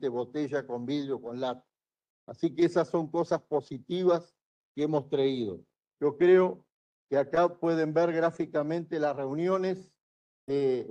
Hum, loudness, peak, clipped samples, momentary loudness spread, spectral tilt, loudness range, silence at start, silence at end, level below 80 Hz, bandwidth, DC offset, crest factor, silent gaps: none; -29 LUFS; -12 dBFS; under 0.1%; 9 LU; -7.5 dB/octave; 4 LU; 0 s; 0 s; -74 dBFS; 8.2 kHz; under 0.1%; 18 dB; 2.10-2.27 s, 4.45-4.75 s, 6.72-7.09 s, 10.01-10.47 s